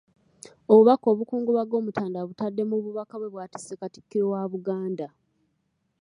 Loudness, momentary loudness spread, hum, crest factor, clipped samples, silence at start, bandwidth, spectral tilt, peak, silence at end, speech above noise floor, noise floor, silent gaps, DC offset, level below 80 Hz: -24 LUFS; 20 LU; none; 22 dB; under 0.1%; 0.7 s; 11 kHz; -7.5 dB/octave; -4 dBFS; 0.95 s; 50 dB; -74 dBFS; none; under 0.1%; -74 dBFS